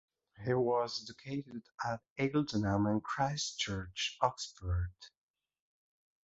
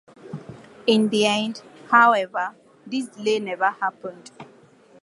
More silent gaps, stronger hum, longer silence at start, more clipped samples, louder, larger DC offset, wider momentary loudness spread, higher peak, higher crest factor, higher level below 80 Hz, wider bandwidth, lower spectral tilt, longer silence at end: first, 2.10-2.16 s vs none; neither; first, 0.4 s vs 0.25 s; neither; second, -36 LUFS vs -21 LUFS; neither; second, 10 LU vs 22 LU; second, -14 dBFS vs -2 dBFS; about the same, 24 dB vs 22 dB; first, -52 dBFS vs -72 dBFS; second, 8 kHz vs 11.5 kHz; about the same, -4.5 dB/octave vs -4 dB/octave; first, 1.2 s vs 0.6 s